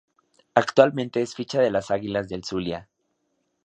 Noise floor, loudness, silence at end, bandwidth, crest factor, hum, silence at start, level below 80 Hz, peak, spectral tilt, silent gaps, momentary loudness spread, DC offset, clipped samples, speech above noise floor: -73 dBFS; -24 LUFS; 0.85 s; 9 kHz; 24 dB; none; 0.55 s; -58 dBFS; 0 dBFS; -5.5 dB/octave; none; 11 LU; under 0.1%; under 0.1%; 50 dB